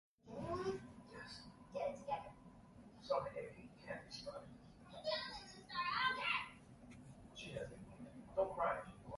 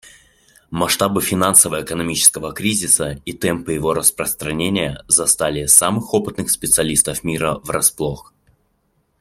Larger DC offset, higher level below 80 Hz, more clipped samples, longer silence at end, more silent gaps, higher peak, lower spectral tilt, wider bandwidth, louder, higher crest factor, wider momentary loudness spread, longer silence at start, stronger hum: neither; second, -68 dBFS vs -46 dBFS; neither; second, 0 s vs 1 s; neither; second, -26 dBFS vs 0 dBFS; first, -4.5 dB/octave vs -2.5 dB/octave; second, 11.5 kHz vs 16.5 kHz; second, -44 LUFS vs -16 LUFS; about the same, 20 dB vs 18 dB; first, 20 LU vs 11 LU; second, 0.25 s vs 0.7 s; neither